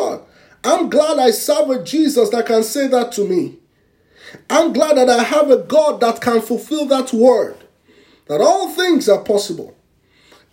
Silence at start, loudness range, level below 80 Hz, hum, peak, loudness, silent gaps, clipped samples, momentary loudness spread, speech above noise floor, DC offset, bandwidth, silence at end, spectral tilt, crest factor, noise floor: 0 s; 3 LU; -64 dBFS; none; 0 dBFS; -15 LUFS; none; under 0.1%; 8 LU; 42 dB; under 0.1%; 16.5 kHz; 0.85 s; -3.5 dB/octave; 16 dB; -57 dBFS